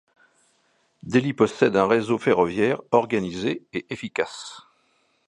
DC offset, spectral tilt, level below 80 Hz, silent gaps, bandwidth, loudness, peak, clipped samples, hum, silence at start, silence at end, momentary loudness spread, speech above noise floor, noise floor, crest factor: under 0.1%; -6 dB/octave; -60 dBFS; none; 11 kHz; -23 LUFS; -2 dBFS; under 0.1%; none; 1.05 s; 0.65 s; 11 LU; 44 dB; -66 dBFS; 22 dB